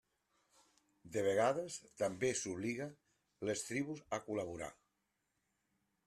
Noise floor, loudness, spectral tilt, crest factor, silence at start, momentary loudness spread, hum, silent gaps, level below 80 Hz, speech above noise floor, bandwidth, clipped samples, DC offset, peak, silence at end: -85 dBFS; -40 LUFS; -4 dB/octave; 20 dB; 1.05 s; 12 LU; none; none; -76 dBFS; 46 dB; 13.5 kHz; under 0.1%; under 0.1%; -22 dBFS; 1.35 s